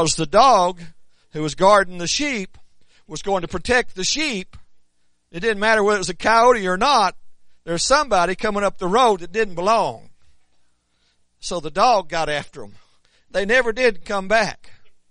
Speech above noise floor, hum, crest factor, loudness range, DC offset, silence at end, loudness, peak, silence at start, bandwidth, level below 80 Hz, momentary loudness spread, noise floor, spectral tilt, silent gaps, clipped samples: 45 dB; none; 18 dB; 6 LU; under 0.1%; 0.2 s; -19 LUFS; -2 dBFS; 0 s; 10.5 kHz; -44 dBFS; 13 LU; -63 dBFS; -3 dB/octave; none; under 0.1%